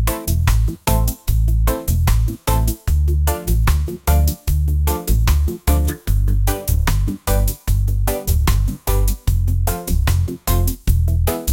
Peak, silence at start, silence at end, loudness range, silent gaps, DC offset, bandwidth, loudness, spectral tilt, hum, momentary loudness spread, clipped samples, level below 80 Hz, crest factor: 0 dBFS; 0 s; 0 s; 1 LU; none; under 0.1%; 17 kHz; -19 LUFS; -5.5 dB/octave; none; 3 LU; under 0.1%; -18 dBFS; 16 dB